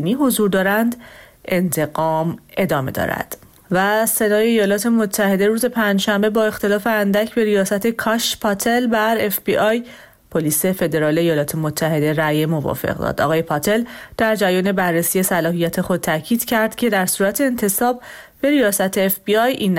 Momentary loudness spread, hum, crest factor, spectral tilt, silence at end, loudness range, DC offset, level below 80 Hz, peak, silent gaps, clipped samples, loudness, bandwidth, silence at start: 6 LU; none; 12 dB; -4.5 dB/octave; 0 s; 2 LU; under 0.1%; -50 dBFS; -6 dBFS; none; under 0.1%; -18 LUFS; 17 kHz; 0 s